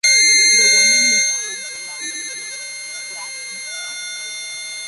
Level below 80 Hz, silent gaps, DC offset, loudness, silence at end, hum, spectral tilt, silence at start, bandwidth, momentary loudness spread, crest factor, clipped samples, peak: -76 dBFS; none; under 0.1%; -13 LUFS; 0 s; none; 3.5 dB/octave; 0.05 s; 11.5 kHz; 18 LU; 16 dB; under 0.1%; -2 dBFS